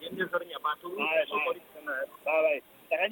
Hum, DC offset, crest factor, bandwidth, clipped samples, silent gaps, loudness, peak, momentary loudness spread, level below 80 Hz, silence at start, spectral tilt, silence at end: none; under 0.1%; 16 dB; 17.5 kHz; under 0.1%; none; -31 LUFS; -14 dBFS; 8 LU; -80 dBFS; 0 s; -4.5 dB/octave; 0 s